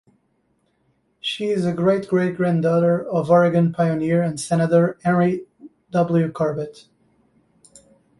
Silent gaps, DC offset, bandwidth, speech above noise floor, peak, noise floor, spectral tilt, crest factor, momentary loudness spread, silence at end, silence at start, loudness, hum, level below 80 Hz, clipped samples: none; under 0.1%; 11.5 kHz; 48 dB; -4 dBFS; -66 dBFS; -7 dB/octave; 16 dB; 8 LU; 1.5 s; 1.25 s; -20 LUFS; none; -60 dBFS; under 0.1%